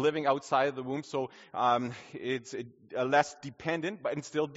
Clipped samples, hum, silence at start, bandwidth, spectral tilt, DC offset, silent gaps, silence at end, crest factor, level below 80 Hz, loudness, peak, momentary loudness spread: under 0.1%; none; 0 s; 8 kHz; -3.5 dB/octave; under 0.1%; none; 0 s; 22 dB; -74 dBFS; -32 LUFS; -10 dBFS; 11 LU